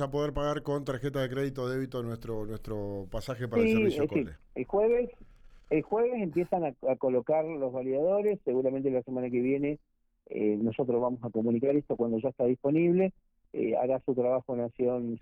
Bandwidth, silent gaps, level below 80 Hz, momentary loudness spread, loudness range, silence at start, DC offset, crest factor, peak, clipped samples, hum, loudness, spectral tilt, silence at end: 14 kHz; none; -52 dBFS; 10 LU; 3 LU; 0 s; under 0.1%; 12 dB; -16 dBFS; under 0.1%; none; -30 LUFS; -8 dB/octave; 0.05 s